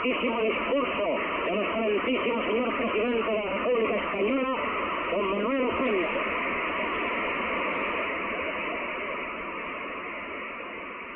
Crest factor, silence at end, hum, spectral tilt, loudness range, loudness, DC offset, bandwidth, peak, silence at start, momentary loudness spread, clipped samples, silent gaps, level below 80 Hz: 12 dB; 0 s; none; -2 dB/octave; 4 LU; -28 LUFS; under 0.1%; 4 kHz; -16 dBFS; 0 s; 8 LU; under 0.1%; none; -56 dBFS